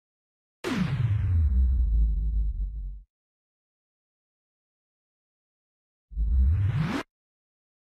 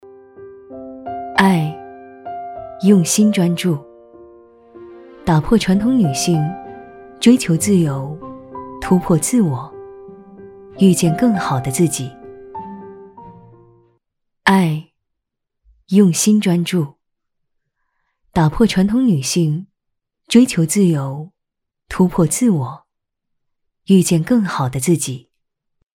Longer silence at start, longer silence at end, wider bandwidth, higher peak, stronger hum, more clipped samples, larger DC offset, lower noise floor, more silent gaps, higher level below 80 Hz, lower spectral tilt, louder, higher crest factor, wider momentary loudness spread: first, 0.65 s vs 0.4 s; first, 0.9 s vs 0.75 s; second, 8.6 kHz vs 16.5 kHz; second, -14 dBFS vs 0 dBFS; neither; neither; neither; first, under -90 dBFS vs -78 dBFS; first, 3.10-6.08 s vs none; first, -30 dBFS vs -44 dBFS; first, -7.5 dB/octave vs -5.5 dB/octave; second, -28 LUFS vs -16 LUFS; about the same, 14 dB vs 18 dB; second, 13 LU vs 20 LU